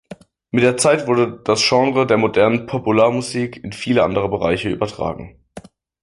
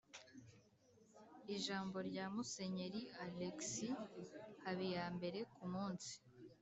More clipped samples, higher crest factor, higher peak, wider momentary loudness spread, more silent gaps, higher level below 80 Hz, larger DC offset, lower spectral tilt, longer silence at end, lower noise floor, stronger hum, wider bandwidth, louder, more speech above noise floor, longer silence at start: neither; about the same, 16 dB vs 16 dB; first, -2 dBFS vs -32 dBFS; second, 11 LU vs 16 LU; neither; first, -48 dBFS vs -82 dBFS; neither; about the same, -4.5 dB/octave vs -4.5 dB/octave; first, 0.4 s vs 0.05 s; second, -41 dBFS vs -72 dBFS; neither; first, 11.5 kHz vs 8.2 kHz; first, -17 LUFS vs -47 LUFS; about the same, 24 dB vs 25 dB; about the same, 0.1 s vs 0.1 s